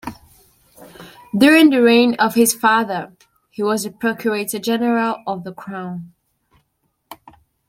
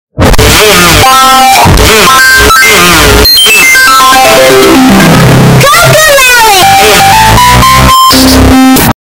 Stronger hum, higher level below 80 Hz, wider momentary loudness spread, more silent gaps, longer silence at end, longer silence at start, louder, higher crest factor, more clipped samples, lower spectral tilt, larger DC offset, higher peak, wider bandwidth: neither; second, -60 dBFS vs -16 dBFS; first, 19 LU vs 2 LU; neither; first, 0.55 s vs 0.15 s; about the same, 0.05 s vs 0.15 s; second, -16 LUFS vs -1 LUFS; first, 18 dB vs 2 dB; second, under 0.1% vs 30%; about the same, -4 dB/octave vs -3 dB/octave; neither; about the same, -2 dBFS vs 0 dBFS; second, 16.5 kHz vs over 20 kHz